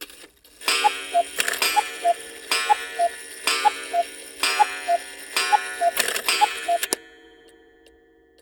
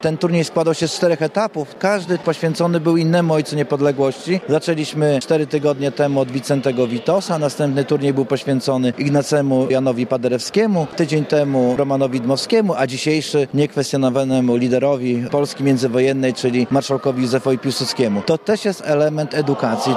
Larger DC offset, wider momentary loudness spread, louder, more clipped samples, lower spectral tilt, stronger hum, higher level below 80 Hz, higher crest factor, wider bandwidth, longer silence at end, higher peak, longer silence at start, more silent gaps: neither; first, 6 LU vs 3 LU; second, -23 LUFS vs -18 LUFS; neither; second, 1 dB/octave vs -6 dB/octave; neither; second, -66 dBFS vs -60 dBFS; first, 22 dB vs 14 dB; first, over 20 kHz vs 14 kHz; first, 1.3 s vs 0 s; about the same, -2 dBFS vs -2 dBFS; about the same, 0 s vs 0 s; neither